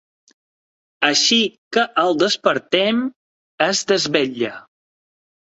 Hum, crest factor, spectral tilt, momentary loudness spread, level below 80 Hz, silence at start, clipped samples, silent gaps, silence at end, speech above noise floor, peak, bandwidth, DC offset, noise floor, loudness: none; 18 dB; -2.5 dB/octave; 8 LU; -66 dBFS; 1 s; under 0.1%; 1.58-1.71 s, 3.16-3.58 s; 0.8 s; over 72 dB; -2 dBFS; 8.2 kHz; under 0.1%; under -90 dBFS; -18 LUFS